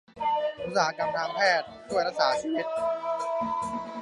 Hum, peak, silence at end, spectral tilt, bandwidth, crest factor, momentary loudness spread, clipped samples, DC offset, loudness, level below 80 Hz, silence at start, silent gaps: none; -8 dBFS; 0 s; -3.5 dB/octave; 11.5 kHz; 20 dB; 6 LU; under 0.1%; under 0.1%; -28 LUFS; -64 dBFS; 0.15 s; none